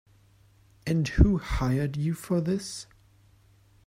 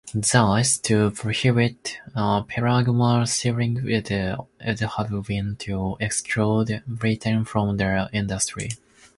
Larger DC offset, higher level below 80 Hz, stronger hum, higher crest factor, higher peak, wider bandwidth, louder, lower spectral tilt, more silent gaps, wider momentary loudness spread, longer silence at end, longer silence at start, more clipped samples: neither; first, -34 dBFS vs -46 dBFS; neither; about the same, 24 dB vs 20 dB; about the same, -4 dBFS vs -4 dBFS; first, 15.5 kHz vs 11.5 kHz; second, -27 LUFS vs -23 LUFS; first, -6.5 dB/octave vs -5 dB/octave; neither; first, 16 LU vs 8 LU; first, 1.05 s vs 0.4 s; first, 0.85 s vs 0.05 s; neither